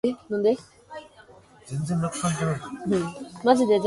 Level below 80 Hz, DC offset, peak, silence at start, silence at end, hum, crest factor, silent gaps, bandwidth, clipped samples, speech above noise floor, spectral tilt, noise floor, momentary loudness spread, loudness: -58 dBFS; under 0.1%; -6 dBFS; 0.05 s; 0 s; none; 20 dB; none; 11.5 kHz; under 0.1%; 27 dB; -6 dB/octave; -52 dBFS; 21 LU; -26 LUFS